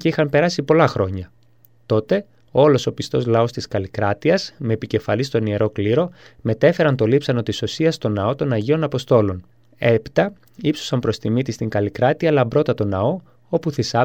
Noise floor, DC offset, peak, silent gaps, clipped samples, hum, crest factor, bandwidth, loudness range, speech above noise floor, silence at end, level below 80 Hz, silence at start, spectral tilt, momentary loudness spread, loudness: -56 dBFS; 0.2%; -2 dBFS; none; under 0.1%; none; 18 dB; 16 kHz; 2 LU; 37 dB; 0 s; -52 dBFS; 0 s; -6.5 dB/octave; 8 LU; -20 LUFS